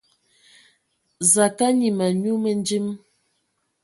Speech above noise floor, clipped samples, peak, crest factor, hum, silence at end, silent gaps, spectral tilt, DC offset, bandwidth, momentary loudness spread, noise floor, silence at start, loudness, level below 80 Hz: 52 dB; under 0.1%; -2 dBFS; 20 dB; none; 0.85 s; none; -4 dB/octave; under 0.1%; 12 kHz; 10 LU; -72 dBFS; 1.2 s; -20 LUFS; -70 dBFS